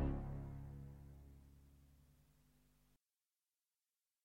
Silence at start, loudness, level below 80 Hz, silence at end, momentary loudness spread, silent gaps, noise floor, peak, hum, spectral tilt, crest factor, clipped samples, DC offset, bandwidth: 0 s; -51 LUFS; -56 dBFS; 2.1 s; 21 LU; none; under -90 dBFS; -28 dBFS; none; -9.5 dB/octave; 22 dB; under 0.1%; under 0.1%; 16 kHz